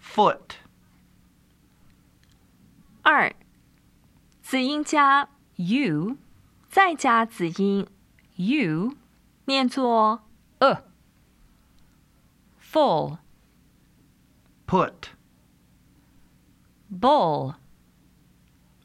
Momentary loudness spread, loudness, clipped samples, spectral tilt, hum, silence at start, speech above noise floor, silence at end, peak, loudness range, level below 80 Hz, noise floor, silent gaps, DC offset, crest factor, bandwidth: 20 LU; -23 LUFS; under 0.1%; -5 dB/octave; none; 0.05 s; 38 dB; 1.3 s; -2 dBFS; 7 LU; -62 dBFS; -60 dBFS; none; under 0.1%; 24 dB; 15 kHz